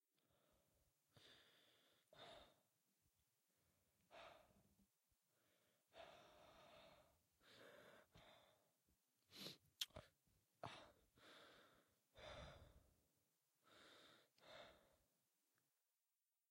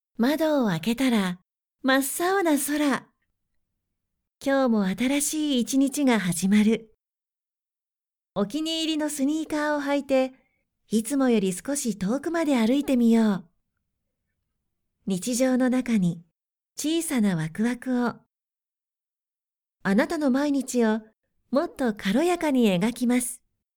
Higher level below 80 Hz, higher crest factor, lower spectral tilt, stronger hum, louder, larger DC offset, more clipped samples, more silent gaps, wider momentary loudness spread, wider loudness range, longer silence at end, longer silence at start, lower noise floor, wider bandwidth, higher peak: second, -82 dBFS vs -62 dBFS; first, 38 dB vs 18 dB; second, -2.5 dB/octave vs -4.5 dB/octave; neither; second, -62 LUFS vs -24 LUFS; neither; neither; neither; first, 15 LU vs 8 LU; first, 10 LU vs 4 LU; first, 0.9 s vs 0.4 s; about the same, 0.15 s vs 0.2 s; about the same, under -90 dBFS vs under -90 dBFS; second, 16 kHz vs over 20 kHz; second, -30 dBFS vs -8 dBFS